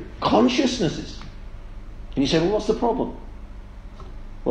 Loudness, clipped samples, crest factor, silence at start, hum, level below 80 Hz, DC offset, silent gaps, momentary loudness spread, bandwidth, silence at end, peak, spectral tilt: -22 LUFS; under 0.1%; 20 dB; 0 s; none; -38 dBFS; under 0.1%; none; 24 LU; 9.6 kHz; 0 s; -4 dBFS; -5.5 dB/octave